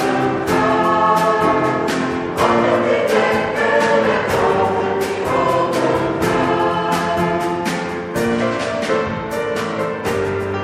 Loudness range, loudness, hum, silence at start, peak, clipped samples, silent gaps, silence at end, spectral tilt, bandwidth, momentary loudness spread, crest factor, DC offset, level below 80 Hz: 4 LU; -17 LUFS; none; 0 s; -2 dBFS; under 0.1%; none; 0 s; -5.5 dB/octave; 15.5 kHz; 6 LU; 16 dB; under 0.1%; -46 dBFS